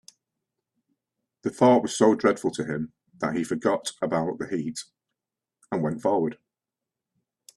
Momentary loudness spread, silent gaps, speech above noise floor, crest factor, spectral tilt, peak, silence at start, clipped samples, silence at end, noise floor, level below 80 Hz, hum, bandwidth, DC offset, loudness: 14 LU; none; 64 dB; 22 dB; -5.5 dB/octave; -6 dBFS; 1.45 s; under 0.1%; 1.25 s; -88 dBFS; -66 dBFS; none; 12.5 kHz; under 0.1%; -25 LUFS